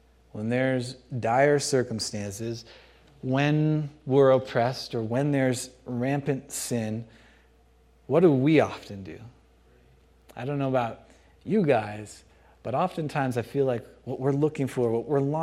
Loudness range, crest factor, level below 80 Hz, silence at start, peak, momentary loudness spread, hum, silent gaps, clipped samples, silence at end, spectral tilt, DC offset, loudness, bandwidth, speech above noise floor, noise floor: 5 LU; 20 dB; -60 dBFS; 0.35 s; -8 dBFS; 17 LU; none; none; under 0.1%; 0 s; -6 dB/octave; under 0.1%; -26 LUFS; 15 kHz; 34 dB; -59 dBFS